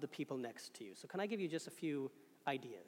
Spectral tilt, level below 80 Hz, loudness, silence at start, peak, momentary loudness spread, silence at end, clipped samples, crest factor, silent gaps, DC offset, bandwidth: -5 dB/octave; under -90 dBFS; -45 LUFS; 0 s; -26 dBFS; 10 LU; 0 s; under 0.1%; 20 dB; none; under 0.1%; 17 kHz